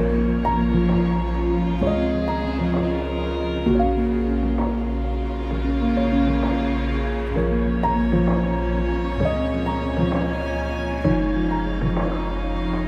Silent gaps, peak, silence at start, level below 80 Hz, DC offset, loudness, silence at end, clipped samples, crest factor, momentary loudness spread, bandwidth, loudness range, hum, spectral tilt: none; -8 dBFS; 0 s; -26 dBFS; under 0.1%; -22 LUFS; 0 s; under 0.1%; 14 dB; 6 LU; 6.4 kHz; 1 LU; none; -9 dB/octave